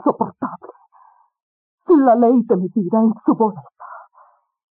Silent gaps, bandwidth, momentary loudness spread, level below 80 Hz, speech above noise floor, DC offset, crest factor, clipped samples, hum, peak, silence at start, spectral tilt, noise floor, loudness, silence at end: 1.43-1.78 s; 2.2 kHz; 25 LU; -68 dBFS; 37 dB; under 0.1%; 14 dB; under 0.1%; none; -4 dBFS; 0.05 s; -10.5 dB/octave; -53 dBFS; -16 LUFS; 0.75 s